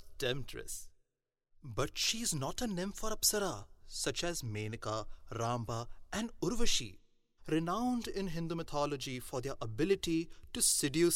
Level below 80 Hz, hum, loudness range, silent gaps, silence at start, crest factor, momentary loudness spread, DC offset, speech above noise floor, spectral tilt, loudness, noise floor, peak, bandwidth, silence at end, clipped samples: -48 dBFS; none; 3 LU; none; 0 s; 20 dB; 13 LU; under 0.1%; 52 dB; -3.5 dB/octave; -36 LUFS; -87 dBFS; -16 dBFS; 16 kHz; 0 s; under 0.1%